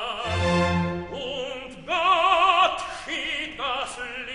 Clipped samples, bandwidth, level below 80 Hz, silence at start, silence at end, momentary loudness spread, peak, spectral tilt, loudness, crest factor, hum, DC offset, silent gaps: under 0.1%; 10.5 kHz; -48 dBFS; 0 s; 0 s; 13 LU; -8 dBFS; -4.5 dB/octave; -24 LUFS; 16 dB; none; 0.2%; none